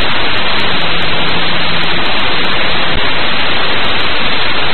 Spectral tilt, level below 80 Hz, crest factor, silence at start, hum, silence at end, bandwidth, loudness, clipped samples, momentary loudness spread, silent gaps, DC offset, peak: -6 dB/octave; -30 dBFS; 12 dB; 0 s; none; 0 s; 12 kHz; -13 LUFS; under 0.1%; 0 LU; none; 40%; 0 dBFS